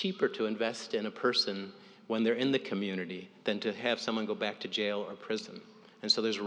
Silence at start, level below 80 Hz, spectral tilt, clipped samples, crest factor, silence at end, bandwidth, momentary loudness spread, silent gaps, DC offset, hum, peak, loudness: 0 s; under -90 dBFS; -4 dB/octave; under 0.1%; 20 dB; 0 s; 10 kHz; 10 LU; none; under 0.1%; none; -14 dBFS; -33 LUFS